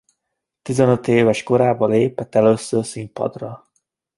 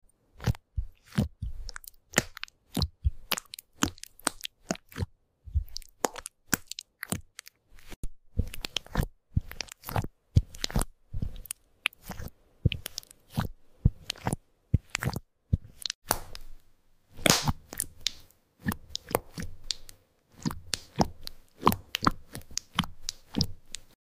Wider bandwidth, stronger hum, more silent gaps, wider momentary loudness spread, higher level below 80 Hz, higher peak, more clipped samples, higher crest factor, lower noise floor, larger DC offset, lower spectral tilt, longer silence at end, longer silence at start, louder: second, 11.5 kHz vs 16 kHz; neither; second, none vs 7.96-8.03 s, 15.95-16.02 s; about the same, 13 LU vs 14 LU; second, -56 dBFS vs -40 dBFS; first, -2 dBFS vs -6 dBFS; neither; second, 18 dB vs 28 dB; first, -79 dBFS vs -60 dBFS; neither; first, -6.5 dB/octave vs -4 dB/octave; first, 0.6 s vs 0.25 s; first, 0.65 s vs 0.4 s; first, -18 LUFS vs -33 LUFS